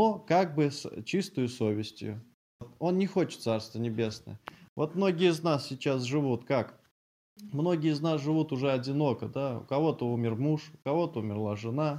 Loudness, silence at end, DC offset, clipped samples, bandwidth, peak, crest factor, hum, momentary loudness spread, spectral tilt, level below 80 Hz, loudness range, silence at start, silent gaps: -30 LUFS; 0 s; under 0.1%; under 0.1%; 15 kHz; -12 dBFS; 18 dB; none; 9 LU; -7 dB/octave; -72 dBFS; 3 LU; 0 s; 2.34-2.59 s, 4.69-4.76 s, 6.91-7.36 s